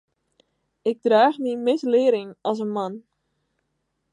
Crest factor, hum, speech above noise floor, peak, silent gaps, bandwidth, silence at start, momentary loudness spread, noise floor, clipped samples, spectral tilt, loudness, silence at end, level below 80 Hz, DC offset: 18 dB; none; 54 dB; -4 dBFS; none; 9.8 kHz; 0.85 s; 11 LU; -75 dBFS; under 0.1%; -6 dB/octave; -22 LUFS; 1.15 s; -80 dBFS; under 0.1%